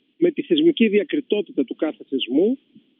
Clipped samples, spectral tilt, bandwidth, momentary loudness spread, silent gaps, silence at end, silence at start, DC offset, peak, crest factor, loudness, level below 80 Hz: under 0.1%; -4 dB/octave; 3.9 kHz; 9 LU; none; 0.45 s; 0.2 s; under 0.1%; -6 dBFS; 16 dB; -21 LUFS; -86 dBFS